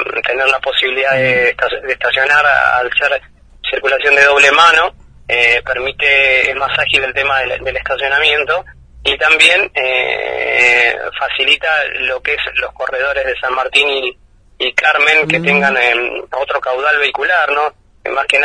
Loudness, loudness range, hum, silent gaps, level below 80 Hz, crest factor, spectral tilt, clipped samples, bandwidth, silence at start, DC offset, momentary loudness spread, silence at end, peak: -12 LUFS; 3 LU; none; none; -42 dBFS; 14 dB; -2.5 dB/octave; under 0.1%; 11 kHz; 0 s; under 0.1%; 10 LU; 0 s; 0 dBFS